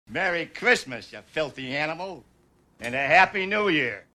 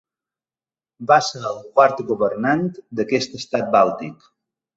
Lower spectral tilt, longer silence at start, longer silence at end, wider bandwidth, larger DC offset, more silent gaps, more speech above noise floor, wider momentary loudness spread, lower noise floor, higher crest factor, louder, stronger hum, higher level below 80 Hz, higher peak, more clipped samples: about the same, -4 dB/octave vs -5 dB/octave; second, 0.1 s vs 1 s; second, 0.15 s vs 0.65 s; first, 13.5 kHz vs 8 kHz; neither; neither; second, 34 dB vs over 71 dB; first, 18 LU vs 12 LU; second, -59 dBFS vs under -90 dBFS; about the same, 22 dB vs 20 dB; second, -24 LUFS vs -19 LUFS; neither; about the same, -60 dBFS vs -64 dBFS; second, -4 dBFS vs 0 dBFS; neither